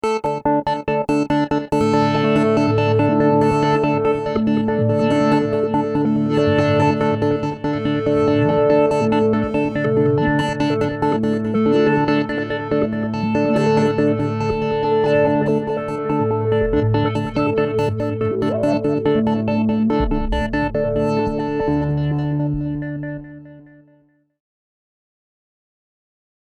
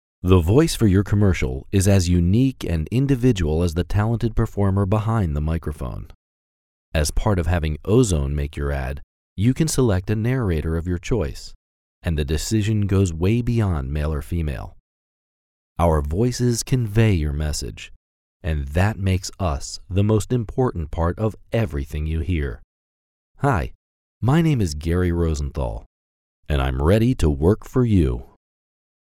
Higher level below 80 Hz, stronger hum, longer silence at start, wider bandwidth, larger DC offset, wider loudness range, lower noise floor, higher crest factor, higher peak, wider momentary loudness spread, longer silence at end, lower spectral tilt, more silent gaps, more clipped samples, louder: second, -38 dBFS vs -32 dBFS; neither; second, 0.05 s vs 0.25 s; second, 10.5 kHz vs 15.5 kHz; neither; about the same, 5 LU vs 4 LU; second, -57 dBFS vs under -90 dBFS; second, 14 dB vs 20 dB; about the same, -4 dBFS vs -2 dBFS; second, 5 LU vs 11 LU; first, 2.85 s vs 0.8 s; first, -8 dB/octave vs -6.5 dB/octave; second, none vs 6.15-6.92 s, 9.03-9.36 s, 11.55-12.01 s, 14.80-15.76 s, 17.96-18.40 s, 22.64-23.35 s, 23.75-24.21 s, 25.86-26.43 s; neither; first, -18 LUFS vs -21 LUFS